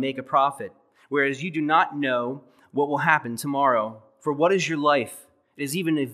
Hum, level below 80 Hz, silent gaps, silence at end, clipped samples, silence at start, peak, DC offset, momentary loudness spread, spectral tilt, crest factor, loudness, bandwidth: none; -82 dBFS; none; 0 s; under 0.1%; 0 s; -4 dBFS; under 0.1%; 12 LU; -5 dB/octave; 22 dB; -24 LUFS; 15 kHz